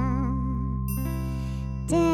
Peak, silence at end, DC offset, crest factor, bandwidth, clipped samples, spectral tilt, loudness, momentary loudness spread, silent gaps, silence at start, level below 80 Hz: -12 dBFS; 0 s; under 0.1%; 14 dB; 17 kHz; under 0.1%; -7.5 dB/octave; -29 LUFS; 6 LU; none; 0 s; -32 dBFS